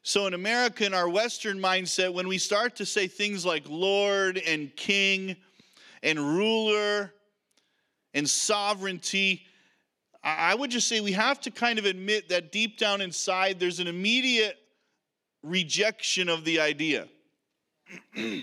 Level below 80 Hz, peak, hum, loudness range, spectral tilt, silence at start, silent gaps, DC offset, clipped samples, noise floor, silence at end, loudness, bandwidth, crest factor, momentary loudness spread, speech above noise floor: -88 dBFS; -8 dBFS; none; 2 LU; -2.5 dB/octave; 0.05 s; none; under 0.1%; under 0.1%; -82 dBFS; 0 s; -26 LUFS; 14.5 kHz; 22 dB; 6 LU; 55 dB